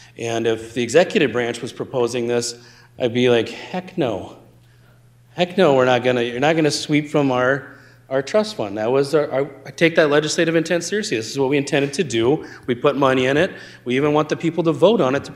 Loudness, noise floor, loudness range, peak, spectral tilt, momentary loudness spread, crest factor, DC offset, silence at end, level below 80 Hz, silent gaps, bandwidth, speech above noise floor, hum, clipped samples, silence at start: -19 LUFS; -50 dBFS; 4 LU; 0 dBFS; -5 dB/octave; 10 LU; 18 dB; under 0.1%; 0 s; -60 dBFS; none; 14 kHz; 32 dB; none; under 0.1%; 0.2 s